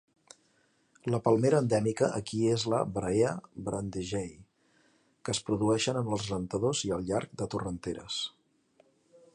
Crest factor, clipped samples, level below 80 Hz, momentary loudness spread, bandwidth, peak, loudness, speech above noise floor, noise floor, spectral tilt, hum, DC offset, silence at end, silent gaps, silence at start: 20 dB; under 0.1%; -58 dBFS; 11 LU; 11 kHz; -12 dBFS; -31 LUFS; 40 dB; -70 dBFS; -5.5 dB/octave; none; under 0.1%; 1.05 s; none; 1.05 s